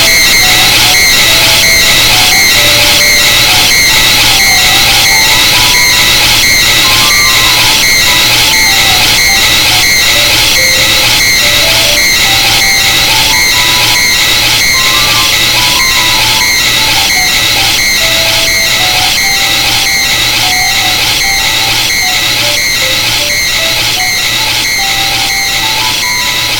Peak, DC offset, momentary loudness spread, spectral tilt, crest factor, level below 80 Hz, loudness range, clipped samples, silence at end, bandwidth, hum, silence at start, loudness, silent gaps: 0 dBFS; under 0.1%; 4 LU; 0 dB/octave; 8 dB; -26 dBFS; 4 LU; 2%; 0 s; over 20 kHz; none; 0 s; -4 LUFS; none